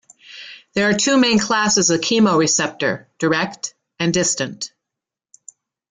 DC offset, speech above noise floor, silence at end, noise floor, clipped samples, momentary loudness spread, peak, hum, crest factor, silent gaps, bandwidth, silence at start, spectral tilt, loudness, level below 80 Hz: under 0.1%; 67 dB; 1.25 s; -85 dBFS; under 0.1%; 16 LU; -4 dBFS; none; 16 dB; none; 10 kHz; 0.3 s; -3 dB/octave; -17 LUFS; -58 dBFS